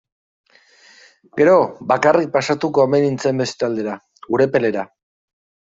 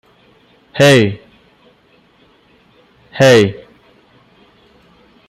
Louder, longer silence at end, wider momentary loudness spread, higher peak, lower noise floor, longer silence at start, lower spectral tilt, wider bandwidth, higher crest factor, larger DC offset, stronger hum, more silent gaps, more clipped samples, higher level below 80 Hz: second, -17 LUFS vs -11 LUFS; second, 0.9 s vs 1.75 s; second, 13 LU vs 24 LU; about the same, -2 dBFS vs 0 dBFS; about the same, -51 dBFS vs -52 dBFS; first, 1.35 s vs 0.75 s; about the same, -6 dB/octave vs -5 dB/octave; second, 7.8 kHz vs 15.5 kHz; about the same, 16 dB vs 16 dB; neither; neither; neither; neither; second, -62 dBFS vs -54 dBFS